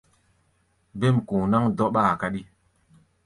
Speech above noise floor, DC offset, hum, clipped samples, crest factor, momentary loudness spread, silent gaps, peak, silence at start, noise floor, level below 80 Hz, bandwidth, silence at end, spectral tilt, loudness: 45 dB; under 0.1%; none; under 0.1%; 18 dB; 11 LU; none; -8 dBFS; 0.95 s; -67 dBFS; -54 dBFS; 11.5 kHz; 0.8 s; -8 dB/octave; -23 LUFS